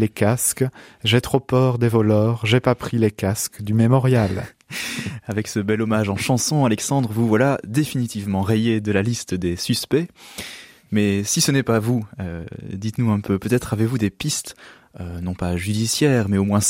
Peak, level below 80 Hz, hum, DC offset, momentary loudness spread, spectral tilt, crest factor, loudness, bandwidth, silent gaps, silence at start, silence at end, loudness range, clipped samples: -2 dBFS; -48 dBFS; none; under 0.1%; 12 LU; -5 dB/octave; 18 dB; -20 LUFS; 16.5 kHz; none; 0 s; 0 s; 4 LU; under 0.1%